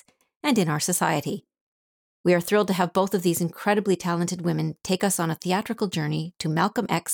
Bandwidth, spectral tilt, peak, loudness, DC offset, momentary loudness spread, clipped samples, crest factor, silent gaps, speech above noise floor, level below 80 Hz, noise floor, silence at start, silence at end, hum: over 20 kHz; -5 dB/octave; -10 dBFS; -24 LUFS; under 0.1%; 6 LU; under 0.1%; 16 dB; 1.61-2.24 s; over 66 dB; -66 dBFS; under -90 dBFS; 0.45 s; 0 s; none